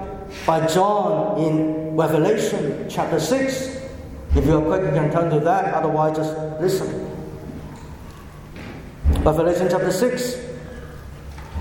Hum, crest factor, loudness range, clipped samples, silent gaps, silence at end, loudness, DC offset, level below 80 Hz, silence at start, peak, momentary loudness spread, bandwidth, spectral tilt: none; 20 dB; 4 LU; under 0.1%; none; 0 s; -20 LUFS; under 0.1%; -32 dBFS; 0 s; -2 dBFS; 19 LU; 17.5 kHz; -6 dB/octave